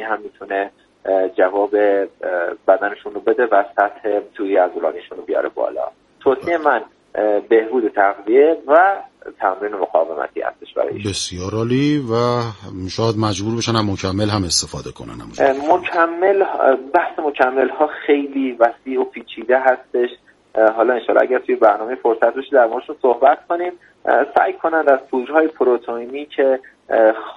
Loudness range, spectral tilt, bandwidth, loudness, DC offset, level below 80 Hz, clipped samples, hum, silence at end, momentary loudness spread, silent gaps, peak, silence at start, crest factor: 4 LU; -5 dB/octave; 11.5 kHz; -18 LUFS; under 0.1%; -54 dBFS; under 0.1%; none; 0 s; 10 LU; none; 0 dBFS; 0 s; 18 dB